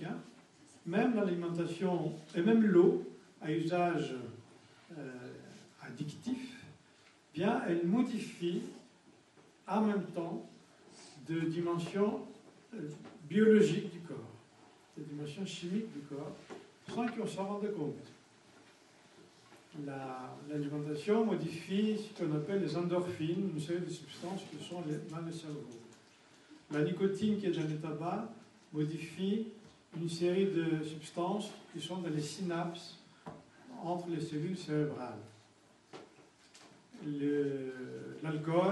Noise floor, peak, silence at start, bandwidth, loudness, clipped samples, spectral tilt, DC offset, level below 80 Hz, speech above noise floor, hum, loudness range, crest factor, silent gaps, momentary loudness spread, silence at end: -65 dBFS; -16 dBFS; 0 s; 11.5 kHz; -36 LUFS; under 0.1%; -7 dB/octave; under 0.1%; -80 dBFS; 30 dB; none; 10 LU; 20 dB; none; 20 LU; 0 s